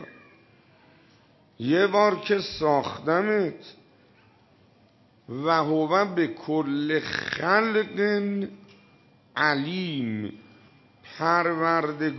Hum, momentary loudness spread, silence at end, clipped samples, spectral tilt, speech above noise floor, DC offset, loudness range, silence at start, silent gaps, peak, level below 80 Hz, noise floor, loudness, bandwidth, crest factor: none; 12 LU; 0 s; under 0.1%; -6.5 dB/octave; 35 dB; under 0.1%; 3 LU; 0 s; none; -6 dBFS; -66 dBFS; -59 dBFS; -25 LUFS; 6.2 kHz; 20 dB